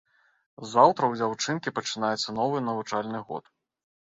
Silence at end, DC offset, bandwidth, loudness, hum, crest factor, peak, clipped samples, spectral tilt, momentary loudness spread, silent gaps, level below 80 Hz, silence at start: 0.65 s; under 0.1%; 8.4 kHz; -26 LUFS; none; 24 dB; -4 dBFS; under 0.1%; -4 dB/octave; 15 LU; none; -70 dBFS; 0.6 s